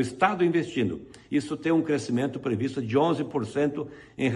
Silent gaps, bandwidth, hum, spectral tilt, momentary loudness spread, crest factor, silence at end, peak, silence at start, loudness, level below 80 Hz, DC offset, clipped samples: none; 11 kHz; none; -6.5 dB/octave; 6 LU; 18 dB; 0 s; -8 dBFS; 0 s; -27 LUFS; -62 dBFS; under 0.1%; under 0.1%